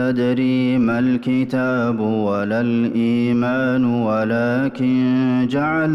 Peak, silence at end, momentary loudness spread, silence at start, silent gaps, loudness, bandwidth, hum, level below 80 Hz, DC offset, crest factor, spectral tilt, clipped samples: -10 dBFS; 0 s; 2 LU; 0 s; none; -18 LUFS; 6 kHz; none; -56 dBFS; under 0.1%; 8 dB; -8.5 dB/octave; under 0.1%